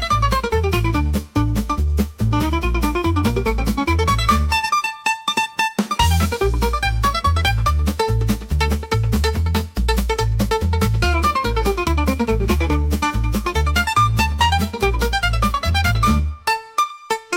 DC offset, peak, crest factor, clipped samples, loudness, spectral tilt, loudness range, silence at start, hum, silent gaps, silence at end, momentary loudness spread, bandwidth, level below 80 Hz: under 0.1%; -4 dBFS; 14 dB; under 0.1%; -19 LUFS; -5 dB/octave; 2 LU; 0 s; none; none; 0 s; 4 LU; 17 kHz; -24 dBFS